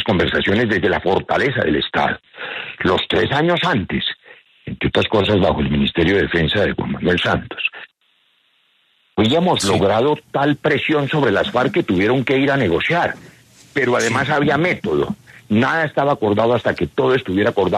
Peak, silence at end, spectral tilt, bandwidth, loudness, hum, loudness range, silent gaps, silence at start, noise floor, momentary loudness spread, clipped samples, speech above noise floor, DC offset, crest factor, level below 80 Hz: -4 dBFS; 0 s; -5.5 dB/octave; 13.5 kHz; -17 LUFS; none; 3 LU; none; 0 s; -61 dBFS; 7 LU; under 0.1%; 44 dB; under 0.1%; 14 dB; -42 dBFS